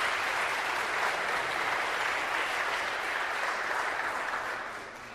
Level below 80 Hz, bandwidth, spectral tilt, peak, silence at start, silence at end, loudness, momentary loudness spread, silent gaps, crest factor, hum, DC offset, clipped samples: -64 dBFS; 15.5 kHz; -1 dB/octave; -16 dBFS; 0 s; 0 s; -30 LUFS; 4 LU; none; 16 dB; none; under 0.1%; under 0.1%